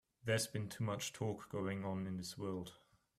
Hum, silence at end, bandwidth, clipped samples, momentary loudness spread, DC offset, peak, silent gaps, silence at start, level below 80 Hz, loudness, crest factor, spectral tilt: none; 0.4 s; 15.5 kHz; under 0.1%; 7 LU; under 0.1%; -24 dBFS; none; 0.25 s; -74 dBFS; -42 LUFS; 20 dB; -4.5 dB/octave